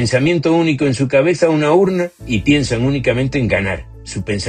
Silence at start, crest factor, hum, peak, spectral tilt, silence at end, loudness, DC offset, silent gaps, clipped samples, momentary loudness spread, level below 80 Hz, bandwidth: 0 s; 16 dB; none; 0 dBFS; -6 dB/octave; 0 s; -15 LUFS; under 0.1%; none; under 0.1%; 9 LU; -36 dBFS; 9.8 kHz